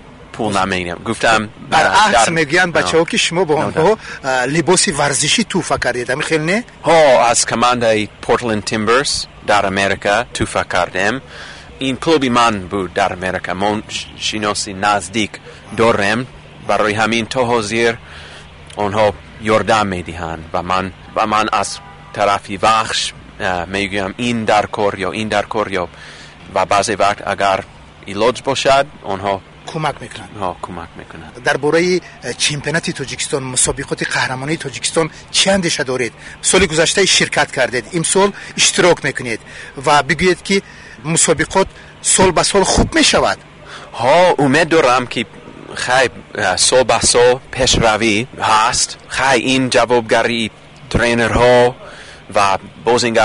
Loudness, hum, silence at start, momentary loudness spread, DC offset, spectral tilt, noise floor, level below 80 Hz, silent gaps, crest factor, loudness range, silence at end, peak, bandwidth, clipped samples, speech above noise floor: -15 LUFS; none; 0.05 s; 13 LU; under 0.1%; -3 dB/octave; -36 dBFS; -38 dBFS; none; 14 dB; 5 LU; 0 s; -2 dBFS; 11 kHz; under 0.1%; 21 dB